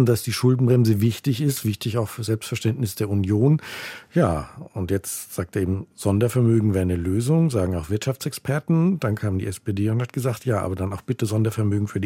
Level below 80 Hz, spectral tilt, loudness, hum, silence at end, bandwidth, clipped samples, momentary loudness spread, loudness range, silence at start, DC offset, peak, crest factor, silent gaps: -52 dBFS; -6.5 dB/octave; -23 LUFS; none; 0 s; 16.5 kHz; under 0.1%; 8 LU; 2 LU; 0 s; under 0.1%; -6 dBFS; 16 dB; none